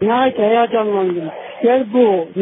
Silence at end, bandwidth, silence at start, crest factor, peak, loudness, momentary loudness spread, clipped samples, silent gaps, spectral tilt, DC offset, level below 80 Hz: 0 s; 3.9 kHz; 0 s; 12 dB; -2 dBFS; -16 LUFS; 6 LU; under 0.1%; none; -11.5 dB/octave; under 0.1%; -58 dBFS